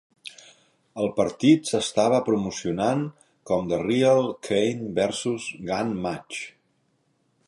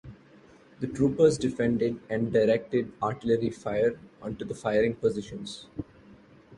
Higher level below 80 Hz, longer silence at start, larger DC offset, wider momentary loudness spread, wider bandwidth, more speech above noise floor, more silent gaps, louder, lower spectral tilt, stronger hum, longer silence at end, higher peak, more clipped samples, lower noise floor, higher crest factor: about the same, -58 dBFS vs -56 dBFS; first, 0.25 s vs 0.05 s; neither; about the same, 15 LU vs 16 LU; about the same, 11.5 kHz vs 11 kHz; first, 45 dB vs 28 dB; neither; first, -24 LUFS vs -27 LUFS; second, -5 dB/octave vs -6.5 dB/octave; neither; first, 1 s vs 0 s; about the same, -6 dBFS vs -8 dBFS; neither; first, -69 dBFS vs -55 dBFS; about the same, 18 dB vs 20 dB